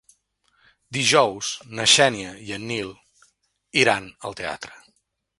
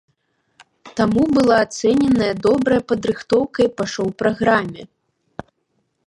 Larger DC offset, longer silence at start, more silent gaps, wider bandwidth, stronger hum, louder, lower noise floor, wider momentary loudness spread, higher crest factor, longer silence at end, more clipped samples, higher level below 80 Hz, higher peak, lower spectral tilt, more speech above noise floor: neither; about the same, 0.9 s vs 0.85 s; neither; about the same, 11.5 kHz vs 11.5 kHz; neither; second, -21 LUFS vs -18 LUFS; about the same, -69 dBFS vs -69 dBFS; about the same, 18 LU vs 19 LU; about the same, 22 dB vs 18 dB; second, 0.65 s vs 1.2 s; neither; second, -60 dBFS vs -48 dBFS; about the same, -2 dBFS vs -2 dBFS; second, -2 dB/octave vs -5.5 dB/octave; second, 47 dB vs 52 dB